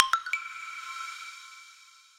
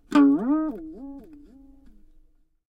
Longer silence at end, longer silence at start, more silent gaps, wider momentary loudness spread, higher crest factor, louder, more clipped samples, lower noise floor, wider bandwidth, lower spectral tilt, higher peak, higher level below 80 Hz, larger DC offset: second, 0.15 s vs 1.5 s; about the same, 0 s vs 0.1 s; neither; about the same, 21 LU vs 23 LU; first, 34 dB vs 18 dB; second, -33 LUFS vs -22 LUFS; neither; about the same, -55 dBFS vs -58 dBFS; first, 16 kHz vs 8 kHz; second, 3.5 dB/octave vs -6.5 dB/octave; first, 0 dBFS vs -6 dBFS; second, -82 dBFS vs -54 dBFS; neither